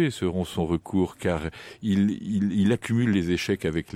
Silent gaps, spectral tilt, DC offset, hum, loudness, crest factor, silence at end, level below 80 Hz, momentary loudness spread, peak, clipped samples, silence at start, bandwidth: none; -6.5 dB/octave; under 0.1%; none; -26 LUFS; 14 dB; 0 s; -48 dBFS; 5 LU; -12 dBFS; under 0.1%; 0 s; 15 kHz